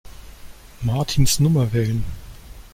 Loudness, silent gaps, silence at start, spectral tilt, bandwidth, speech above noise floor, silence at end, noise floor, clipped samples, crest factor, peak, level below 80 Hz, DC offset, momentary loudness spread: -20 LUFS; none; 0.05 s; -5 dB/octave; 16.5 kHz; 21 dB; 0.05 s; -39 dBFS; under 0.1%; 16 dB; -4 dBFS; -34 dBFS; under 0.1%; 14 LU